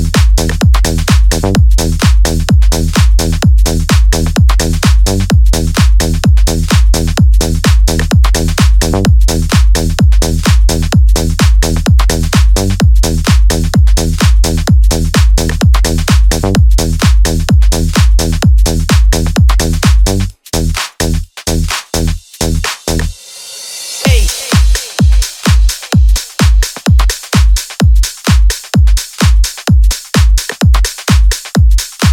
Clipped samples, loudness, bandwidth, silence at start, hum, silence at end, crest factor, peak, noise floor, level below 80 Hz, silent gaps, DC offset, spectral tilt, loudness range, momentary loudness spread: under 0.1%; -11 LUFS; 16.5 kHz; 0 s; none; 0 s; 8 dB; 0 dBFS; -29 dBFS; -10 dBFS; none; under 0.1%; -5 dB/octave; 3 LU; 5 LU